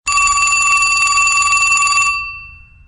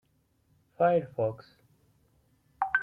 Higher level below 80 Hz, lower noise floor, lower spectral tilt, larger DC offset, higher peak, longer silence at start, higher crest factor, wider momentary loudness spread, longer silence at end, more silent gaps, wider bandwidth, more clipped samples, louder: first, -40 dBFS vs -70 dBFS; second, -37 dBFS vs -71 dBFS; second, 2.5 dB/octave vs -8.5 dB/octave; neither; first, 0 dBFS vs -12 dBFS; second, 0.05 s vs 0.8 s; second, 14 dB vs 20 dB; about the same, 8 LU vs 9 LU; first, 0.35 s vs 0 s; neither; first, 11.5 kHz vs 5 kHz; neither; first, -11 LUFS vs -29 LUFS